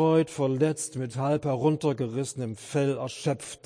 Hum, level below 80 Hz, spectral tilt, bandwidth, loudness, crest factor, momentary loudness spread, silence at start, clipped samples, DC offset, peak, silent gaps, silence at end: none; -66 dBFS; -6 dB/octave; 10.5 kHz; -28 LUFS; 16 dB; 7 LU; 0 s; under 0.1%; under 0.1%; -12 dBFS; none; 0.1 s